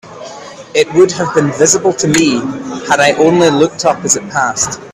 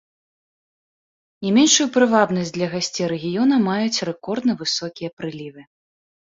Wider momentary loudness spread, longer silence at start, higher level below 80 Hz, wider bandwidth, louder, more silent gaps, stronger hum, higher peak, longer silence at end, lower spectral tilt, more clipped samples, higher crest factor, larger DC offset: second, 13 LU vs 16 LU; second, 0.05 s vs 1.4 s; first, -48 dBFS vs -62 dBFS; first, 15 kHz vs 7.8 kHz; first, -11 LUFS vs -19 LUFS; second, none vs 5.13-5.17 s; neither; about the same, 0 dBFS vs -2 dBFS; second, 0 s vs 0.8 s; about the same, -3.5 dB/octave vs -3.5 dB/octave; neither; second, 12 dB vs 20 dB; neither